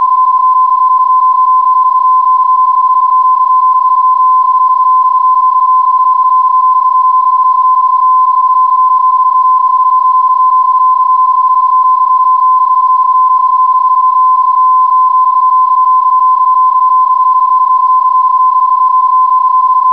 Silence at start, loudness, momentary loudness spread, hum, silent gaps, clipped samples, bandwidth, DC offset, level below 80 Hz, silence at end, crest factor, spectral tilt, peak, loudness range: 0 s; -7 LUFS; 1 LU; none; none; under 0.1%; 1.2 kHz; 0.4%; -72 dBFS; 0 s; 4 dB; -2 dB/octave; -4 dBFS; 0 LU